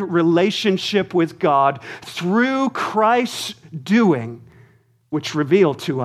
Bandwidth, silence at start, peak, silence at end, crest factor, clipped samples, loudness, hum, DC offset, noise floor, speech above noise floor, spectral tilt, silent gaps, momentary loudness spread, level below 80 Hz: 14.5 kHz; 0 s; -4 dBFS; 0 s; 16 dB; under 0.1%; -18 LUFS; none; under 0.1%; -54 dBFS; 36 dB; -5.5 dB/octave; none; 12 LU; -66 dBFS